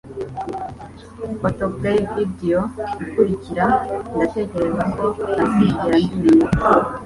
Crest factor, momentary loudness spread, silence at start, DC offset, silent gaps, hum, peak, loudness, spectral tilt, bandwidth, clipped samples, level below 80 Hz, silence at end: 18 dB; 14 LU; 0.05 s; under 0.1%; none; none; -2 dBFS; -19 LUFS; -8 dB/octave; 11.5 kHz; under 0.1%; -40 dBFS; 0 s